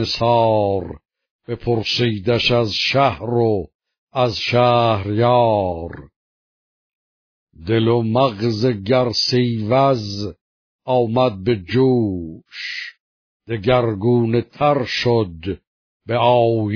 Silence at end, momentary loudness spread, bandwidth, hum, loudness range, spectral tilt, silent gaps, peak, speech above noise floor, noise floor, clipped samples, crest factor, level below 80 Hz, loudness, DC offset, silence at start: 0 s; 14 LU; 5.4 kHz; none; 3 LU; -6.5 dB/octave; 1.31-1.39 s, 3.75-3.79 s, 3.98-4.07 s, 6.16-7.47 s, 10.41-10.79 s, 13.00-13.40 s, 15.67-16.00 s; -2 dBFS; over 72 dB; under -90 dBFS; under 0.1%; 16 dB; -48 dBFS; -18 LUFS; under 0.1%; 0 s